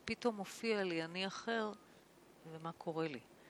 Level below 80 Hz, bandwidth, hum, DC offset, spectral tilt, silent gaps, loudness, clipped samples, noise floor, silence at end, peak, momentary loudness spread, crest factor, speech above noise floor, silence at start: -76 dBFS; 17 kHz; none; under 0.1%; -4.5 dB/octave; none; -41 LUFS; under 0.1%; -64 dBFS; 0 s; -22 dBFS; 13 LU; 20 dB; 23 dB; 0 s